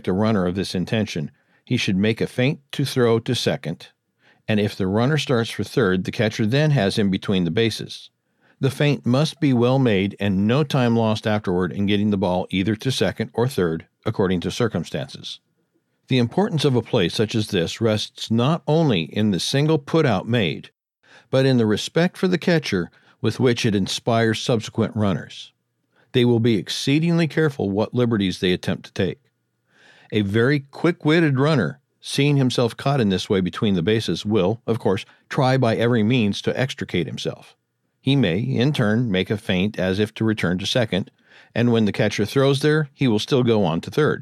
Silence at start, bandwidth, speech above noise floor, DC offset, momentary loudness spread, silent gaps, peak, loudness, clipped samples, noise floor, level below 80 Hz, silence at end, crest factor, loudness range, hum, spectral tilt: 0.05 s; 14 kHz; 48 dB; under 0.1%; 8 LU; none; -6 dBFS; -21 LUFS; under 0.1%; -69 dBFS; -58 dBFS; 0 s; 16 dB; 3 LU; none; -6 dB/octave